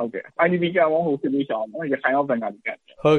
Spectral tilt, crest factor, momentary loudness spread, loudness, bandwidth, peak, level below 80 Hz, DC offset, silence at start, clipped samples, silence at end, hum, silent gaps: -7.5 dB/octave; 18 dB; 10 LU; -23 LUFS; 6.6 kHz; -4 dBFS; -66 dBFS; under 0.1%; 0 s; under 0.1%; 0 s; none; none